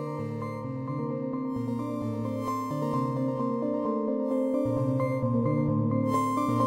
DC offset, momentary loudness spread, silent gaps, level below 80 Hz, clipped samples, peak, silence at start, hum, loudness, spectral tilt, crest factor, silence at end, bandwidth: under 0.1%; 7 LU; none; -60 dBFS; under 0.1%; -14 dBFS; 0 s; none; -29 LUFS; -8.5 dB/octave; 14 dB; 0 s; 16 kHz